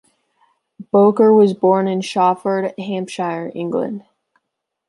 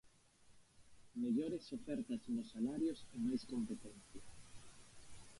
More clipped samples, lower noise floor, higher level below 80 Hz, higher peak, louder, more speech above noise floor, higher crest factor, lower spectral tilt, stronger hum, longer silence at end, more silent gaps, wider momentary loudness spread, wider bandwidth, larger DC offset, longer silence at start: neither; first, -77 dBFS vs -68 dBFS; about the same, -68 dBFS vs -70 dBFS; first, -2 dBFS vs -28 dBFS; first, -17 LUFS vs -43 LUFS; first, 61 dB vs 26 dB; about the same, 16 dB vs 16 dB; about the same, -7 dB/octave vs -6 dB/octave; neither; first, 0.9 s vs 0 s; neither; second, 13 LU vs 21 LU; about the same, 11.5 kHz vs 11.5 kHz; neither; first, 0.8 s vs 0.05 s